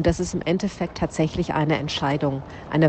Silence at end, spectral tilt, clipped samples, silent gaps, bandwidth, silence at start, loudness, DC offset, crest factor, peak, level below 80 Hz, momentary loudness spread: 0 s; -6 dB/octave; under 0.1%; none; 8.8 kHz; 0 s; -24 LUFS; under 0.1%; 18 dB; -4 dBFS; -40 dBFS; 5 LU